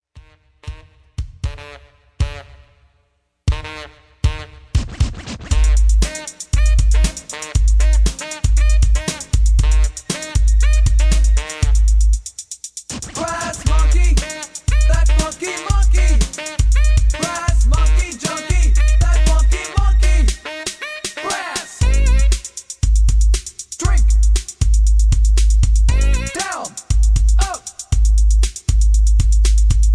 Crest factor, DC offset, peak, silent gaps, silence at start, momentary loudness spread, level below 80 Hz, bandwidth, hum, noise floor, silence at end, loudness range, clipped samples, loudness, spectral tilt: 12 dB; under 0.1%; -2 dBFS; none; 0.15 s; 12 LU; -14 dBFS; 11 kHz; none; -64 dBFS; 0 s; 7 LU; under 0.1%; -18 LUFS; -4.5 dB/octave